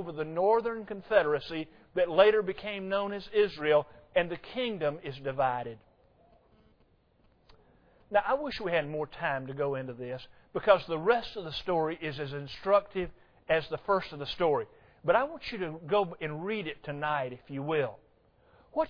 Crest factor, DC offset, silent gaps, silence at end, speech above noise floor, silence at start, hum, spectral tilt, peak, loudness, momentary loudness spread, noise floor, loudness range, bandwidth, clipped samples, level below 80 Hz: 24 dB; under 0.1%; none; 0 s; 36 dB; 0 s; none; -7 dB/octave; -8 dBFS; -31 LUFS; 12 LU; -66 dBFS; 7 LU; 5.4 kHz; under 0.1%; -60 dBFS